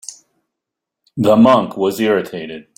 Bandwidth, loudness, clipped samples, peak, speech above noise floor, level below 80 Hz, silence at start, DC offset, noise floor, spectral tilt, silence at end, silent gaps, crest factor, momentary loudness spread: 16.5 kHz; -14 LUFS; under 0.1%; -2 dBFS; 67 dB; -54 dBFS; 0.1 s; under 0.1%; -82 dBFS; -6 dB/octave; 0.15 s; none; 16 dB; 19 LU